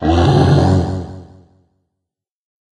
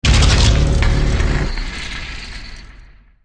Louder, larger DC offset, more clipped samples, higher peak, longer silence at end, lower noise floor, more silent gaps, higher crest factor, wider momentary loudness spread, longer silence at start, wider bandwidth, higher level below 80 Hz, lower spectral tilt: first, -13 LUFS vs -17 LUFS; neither; neither; about the same, 0 dBFS vs -2 dBFS; first, 1.5 s vs 0.4 s; first, -81 dBFS vs -42 dBFS; neither; about the same, 16 dB vs 14 dB; second, 15 LU vs 18 LU; about the same, 0 s vs 0 s; about the same, 10 kHz vs 10 kHz; second, -32 dBFS vs -18 dBFS; first, -7.5 dB/octave vs -4.5 dB/octave